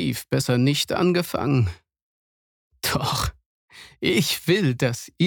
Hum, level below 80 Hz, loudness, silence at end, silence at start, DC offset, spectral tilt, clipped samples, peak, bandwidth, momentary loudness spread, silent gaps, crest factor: none; -46 dBFS; -23 LUFS; 0 s; 0 s; under 0.1%; -5 dB/octave; under 0.1%; -6 dBFS; 19 kHz; 6 LU; 2.02-2.70 s, 3.46-3.68 s; 18 dB